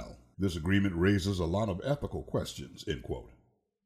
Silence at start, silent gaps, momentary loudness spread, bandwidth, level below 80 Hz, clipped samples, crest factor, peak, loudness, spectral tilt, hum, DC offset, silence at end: 0 s; none; 13 LU; 14.5 kHz; -48 dBFS; under 0.1%; 18 dB; -14 dBFS; -32 LUFS; -6.5 dB/octave; none; under 0.1%; 0.55 s